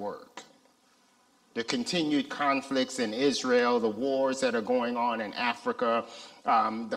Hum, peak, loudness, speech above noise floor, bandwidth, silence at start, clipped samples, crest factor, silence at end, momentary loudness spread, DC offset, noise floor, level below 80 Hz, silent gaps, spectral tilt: none; -10 dBFS; -28 LUFS; 36 dB; 12.5 kHz; 0 s; under 0.1%; 20 dB; 0 s; 12 LU; under 0.1%; -65 dBFS; -74 dBFS; none; -3.5 dB/octave